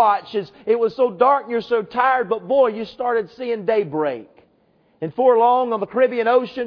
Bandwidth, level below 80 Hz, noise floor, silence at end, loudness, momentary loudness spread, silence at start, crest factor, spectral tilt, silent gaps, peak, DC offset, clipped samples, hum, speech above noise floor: 5.4 kHz; -66 dBFS; -59 dBFS; 0 s; -19 LUFS; 10 LU; 0 s; 16 dB; -7.5 dB/octave; none; -2 dBFS; under 0.1%; under 0.1%; none; 41 dB